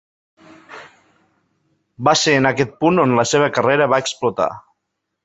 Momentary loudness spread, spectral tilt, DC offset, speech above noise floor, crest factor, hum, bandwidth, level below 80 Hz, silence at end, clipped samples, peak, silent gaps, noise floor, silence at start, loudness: 23 LU; -4 dB/octave; under 0.1%; 60 dB; 18 dB; none; 8.2 kHz; -58 dBFS; 0.65 s; under 0.1%; 0 dBFS; none; -76 dBFS; 0.7 s; -16 LUFS